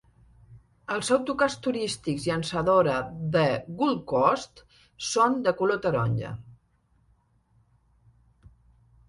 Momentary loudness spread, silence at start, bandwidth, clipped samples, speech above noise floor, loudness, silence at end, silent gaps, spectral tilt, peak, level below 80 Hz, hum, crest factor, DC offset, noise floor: 10 LU; 0.5 s; 11.5 kHz; under 0.1%; 41 dB; -26 LUFS; 2.55 s; none; -5 dB/octave; -8 dBFS; -58 dBFS; none; 20 dB; under 0.1%; -66 dBFS